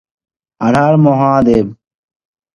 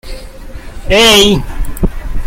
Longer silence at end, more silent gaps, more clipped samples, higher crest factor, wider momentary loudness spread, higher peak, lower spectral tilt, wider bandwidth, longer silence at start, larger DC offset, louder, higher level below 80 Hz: first, 0.8 s vs 0 s; neither; second, under 0.1% vs 0.2%; about the same, 14 dB vs 12 dB; second, 8 LU vs 25 LU; about the same, 0 dBFS vs 0 dBFS; first, -8.5 dB/octave vs -3 dB/octave; second, 10.5 kHz vs 16.5 kHz; first, 0.6 s vs 0.05 s; neither; about the same, -11 LUFS vs -9 LUFS; second, -44 dBFS vs -20 dBFS